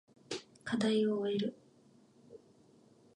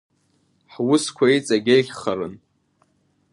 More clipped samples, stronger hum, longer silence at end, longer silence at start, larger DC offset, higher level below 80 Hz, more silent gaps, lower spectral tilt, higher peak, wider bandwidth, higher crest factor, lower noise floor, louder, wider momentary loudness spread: neither; neither; second, 0.8 s vs 0.95 s; second, 0.3 s vs 0.8 s; neither; second, -80 dBFS vs -64 dBFS; neither; about the same, -5.5 dB/octave vs -4.5 dB/octave; second, -20 dBFS vs -4 dBFS; about the same, 11 kHz vs 11.5 kHz; about the same, 18 dB vs 18 dB; about the same, -64 dBFS vs -65 dBFS; second, -35 LUFS vs -20 LUFS; first, 14 LU vs 10 LU